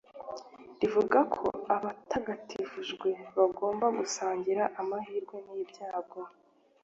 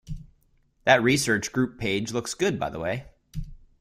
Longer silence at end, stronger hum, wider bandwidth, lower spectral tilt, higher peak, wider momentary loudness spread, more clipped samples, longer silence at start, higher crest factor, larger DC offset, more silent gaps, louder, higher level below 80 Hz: first, 0.55 s vs 0.25 s; neither; second, 8 kHz vs 16 kHz; about the same, -4 dB/octave vs -4 dB/octave; second, -10 dBFS vs -4 dBFS; second, 17 LU vs 20 LU; neither; about the same, 0.15 s vs 0.05 s; about the same, 22 dB vs 22 dB; neither; neither; second, -32 LUFS vs -25 LUFS; second, -70 dBFS vs -46 dBFS